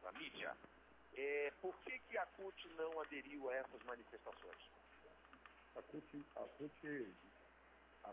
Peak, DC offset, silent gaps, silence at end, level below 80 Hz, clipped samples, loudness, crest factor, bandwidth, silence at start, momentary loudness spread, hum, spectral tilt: -34 dBFS; under 0.1%; none; 0 s; -78 dBFS; under 0.1%; -50 LUFS; 18 dB; 4 kHz; 0 s; 20 LU; none; -2 dB/octave